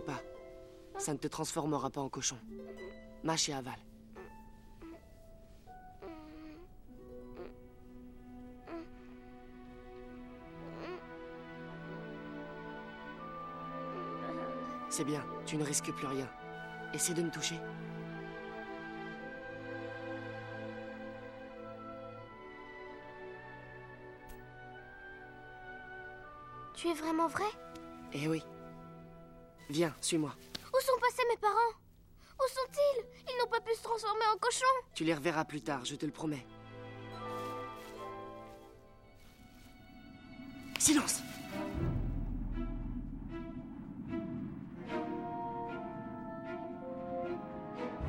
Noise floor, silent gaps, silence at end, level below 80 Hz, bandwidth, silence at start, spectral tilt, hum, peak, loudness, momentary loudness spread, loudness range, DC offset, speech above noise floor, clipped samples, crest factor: -60 dBFS; none; 0 s; -54 dBFS; 16 kHz; 0 s; -3.5 dB/octave; none; -14 dBFS; -38 LUFS; 21 LU; 16 LU; under 0.1%; 24 dB; under 0.1%; 26 dB